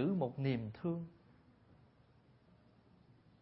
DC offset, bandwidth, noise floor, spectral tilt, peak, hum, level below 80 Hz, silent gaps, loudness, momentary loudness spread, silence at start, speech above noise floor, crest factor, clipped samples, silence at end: under 0.1%; 5.6 kHz; -67 dBFS; -8 dB/octave; -24 dBFS; none; -72 dBFS; none; -40 LUFS; 8 LU; 0 s; 30 dB; 18 dB; under 0.1%; 2.3 s